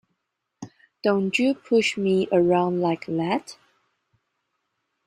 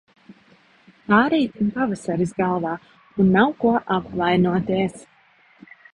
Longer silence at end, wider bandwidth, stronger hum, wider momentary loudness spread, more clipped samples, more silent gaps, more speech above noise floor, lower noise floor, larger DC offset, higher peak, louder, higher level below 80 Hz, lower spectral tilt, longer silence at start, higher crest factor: first, 1.55 s vs 0.9 s; about the same, 11.5 kHz vs 11 kHz; neither; first, 23 LU vs 10 LU; neither; neither; first, 57 dB vs 36 dB; first, -79 dBFS vs -56 dBFS; neither; second, -8 dBFS vs -2 dBFS; about the same, -23 LUFS vs -21 LUFS; second, -66 dBFS vs -54 dBFS; about the same, -6 dB/octave vs -7 dB/octave; first, 0.6 s vs 0.3 s; about the same, 16 dB vs 20 dB